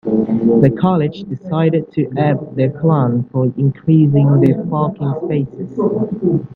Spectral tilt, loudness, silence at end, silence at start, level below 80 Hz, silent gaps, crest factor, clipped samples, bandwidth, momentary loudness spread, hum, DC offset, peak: -11.5 dB/octave; -15 LUFS; 0 s; 0.05 s; -50 dBFS; none; 14 dB; under 0.1%; 4.5 kHz; 8 LU; none; under 0.1%; 0 dBFS